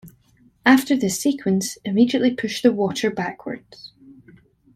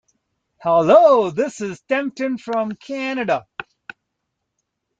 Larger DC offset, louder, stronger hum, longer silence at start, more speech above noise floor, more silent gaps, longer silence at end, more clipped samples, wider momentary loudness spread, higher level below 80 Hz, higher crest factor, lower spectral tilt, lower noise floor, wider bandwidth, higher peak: neither; about the same, -20 LUFS vs -18 LUFS; neither; second, 0.05 s vs 0.6 s; second, 37 dB vs 59 dB; neither; second, 0.65 s vs 1.35 s; neither; about the same, 15 LU vs 17 LU; about the same, -62 dBFS vs -66 dBFS; about the same, 20 dB vs 18 dB; about the same, -4.5 dB/octave vs -5.5 dB/octave; second, -57 dBFS vs -77 dBFS; first, 15.5 kHz vs 8.8 kHz; about the same, -2 dBFS vs -2 dBFS